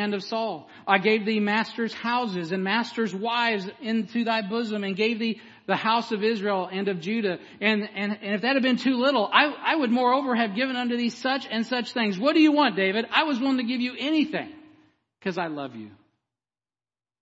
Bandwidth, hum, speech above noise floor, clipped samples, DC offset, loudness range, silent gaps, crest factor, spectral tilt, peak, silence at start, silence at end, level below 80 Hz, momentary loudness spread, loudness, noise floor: 8 kHz; none; over 65 dB; under 0.1%; under 0.1%; 4 LU; none; 24 dB; -5.5 dB/octave; -2 dBFS; 0 s; 1.3 s; -78 dBFS; 9 LU; -25 LUFS; under -90 dBFS